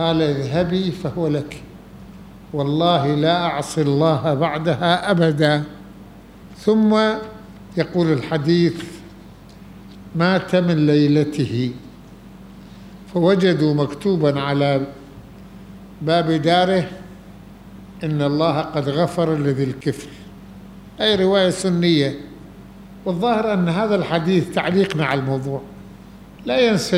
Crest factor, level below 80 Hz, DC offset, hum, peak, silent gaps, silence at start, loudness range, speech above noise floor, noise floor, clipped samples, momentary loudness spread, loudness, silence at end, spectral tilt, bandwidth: 18 dB; -50 dBFS; under 0.1%; none; -2 dBFS; none; 0 s; 3 LU; 23 dB; -41 dBFS; under 0.1%; 23 LU; -19 LUFS; 0 s; -6.5 dB/octave; 13.5 kHz